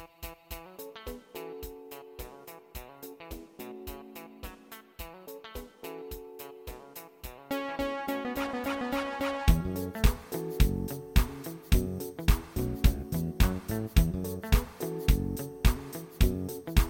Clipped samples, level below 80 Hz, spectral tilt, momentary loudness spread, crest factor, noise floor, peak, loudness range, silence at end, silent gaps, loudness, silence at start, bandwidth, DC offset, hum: under 0.1%; -32 dBFS; -5.5 dB/octave; 17 LU; 24 dB; -50 dBFS; -8 dBFS; 15 LU; 0 s; none; -32 LUFS; 0 s; 17 kHz; under 0.1%; none